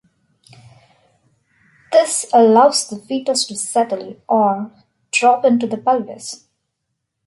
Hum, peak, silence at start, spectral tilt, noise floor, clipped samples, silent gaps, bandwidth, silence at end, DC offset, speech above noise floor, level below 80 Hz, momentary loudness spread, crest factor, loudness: none; -2 dBFS; 1.9 s; -3 dB/octave; -75 dBFS; under 0.1%; none; 11.5 kHz; 0.9 s; under 0.1%; 59 dB; -70 dBFS; 16 LU; 16 dB; -16 LUFS